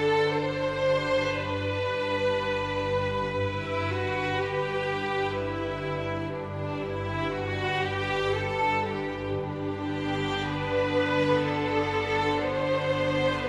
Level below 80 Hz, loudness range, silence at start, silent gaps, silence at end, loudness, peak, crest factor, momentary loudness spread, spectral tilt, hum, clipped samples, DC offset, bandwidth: -52 dBFS; 3 LU; 0 s; none; 0 s; -28 LUFS; -14 dBFS; 14 dB; 6 LU; -6 dB/octave; 50 Hz at -60 dBFS; under 0.1%; under 0.1%; 11 kHz